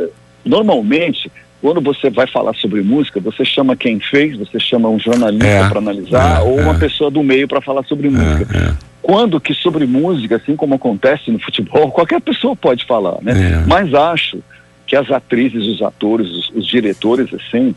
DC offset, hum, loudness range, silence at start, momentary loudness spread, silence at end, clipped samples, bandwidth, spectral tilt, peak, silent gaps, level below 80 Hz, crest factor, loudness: under 0.1%; none; 2 LU; 0 s; 6 LU; 0 s; under 0.1%; 11.5 kHz; -6.5 dB/octave; -2 dBFS; none; -28 dBFS; 12 dB; -14 LUFS